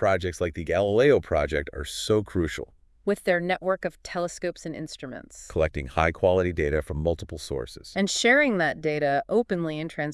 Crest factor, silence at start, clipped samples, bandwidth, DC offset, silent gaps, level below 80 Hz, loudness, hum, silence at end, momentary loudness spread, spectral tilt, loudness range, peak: 18 dB; 0 s; under 0.1%; 12 kHz; under 0.1%; none; -44 dBFS; -25 LUFS; none; 0 s; 13 LU; -5 dB/octave; 5 LU; -8 dBFS